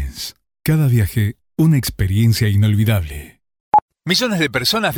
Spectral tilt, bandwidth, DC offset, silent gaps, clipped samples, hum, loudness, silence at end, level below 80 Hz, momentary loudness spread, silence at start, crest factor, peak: -5.5 dB/octave; 19 kHz; under 0.1%; 3.60-3.72 s, 3.82-3.88 s; under 0.1%; none; -17 LUFS; 0 s; -36 dBFS; 11 LU; 0 s; 14 dB; -2 dBFS